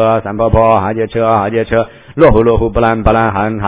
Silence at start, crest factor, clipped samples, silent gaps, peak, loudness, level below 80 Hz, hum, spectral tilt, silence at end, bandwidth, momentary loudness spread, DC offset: 0 s; 10 dB; 0.7%; none; 0 dBFS; -11 LUFS; -24 dBFS; none; -11.5 dB/octave; 0 s; 4 kHz; 6 LU; 0.3%